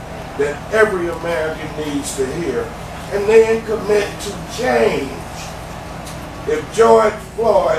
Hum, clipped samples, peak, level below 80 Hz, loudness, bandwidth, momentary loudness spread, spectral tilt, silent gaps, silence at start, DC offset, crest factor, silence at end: none; under 0.1%; 0 dBFS; -38 dBFS; -17 LUFS; 14.5 kHz; 17 LU; -4.5 dB/octave; none; 0 s; under 0.1%; 18 dB; 0 s